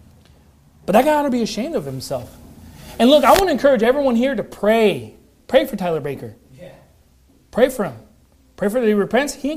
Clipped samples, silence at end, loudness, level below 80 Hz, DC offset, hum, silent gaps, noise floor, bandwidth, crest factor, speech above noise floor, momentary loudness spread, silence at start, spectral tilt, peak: under 0.1%; 0 s; -18 LUFS; -46 dBFS; under 0.1%; none; none; -54 dBFS; 15.5 kHz; 18 dB; 37 dB; 15 LU; 0.9 s; -5 dB/octave; 0 dBFS